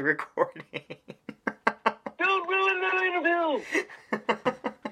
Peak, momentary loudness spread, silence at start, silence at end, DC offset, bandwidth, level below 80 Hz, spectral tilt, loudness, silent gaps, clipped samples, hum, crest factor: -4 dBFS; 16 LU; 0 s; 0 s; under 0.1%; 12.5 kHz; -74 dBFS; -4 dB/octave; -27 LUFS; none; under 0.1%; none; 24 dB